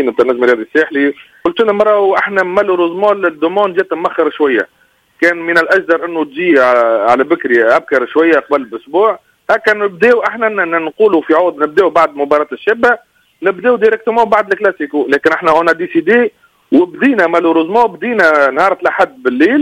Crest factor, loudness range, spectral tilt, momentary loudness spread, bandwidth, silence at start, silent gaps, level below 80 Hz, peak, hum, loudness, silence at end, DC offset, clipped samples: 12 dB; 2 LU; -5.5 dB/octave; 5 LU; 11 kHz; 0 s; none; -56 dBFS; 0 dBFS; none; -12 LUFS; 0 s; under 0.1%; under 0.1%